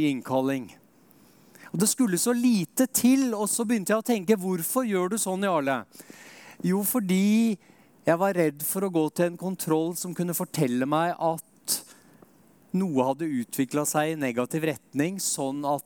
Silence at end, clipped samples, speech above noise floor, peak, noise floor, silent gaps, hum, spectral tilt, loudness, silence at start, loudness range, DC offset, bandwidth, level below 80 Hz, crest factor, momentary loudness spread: 0.05 s; under 0.1%; 32 dB; -8 dBFS; -58 dBFS; none; none; -4.5 dB/octave; -26 LUFS; 0 s; 4 LU; under 0.1%; 18 kHz; -76 dBFS; 18 dB; 8 LU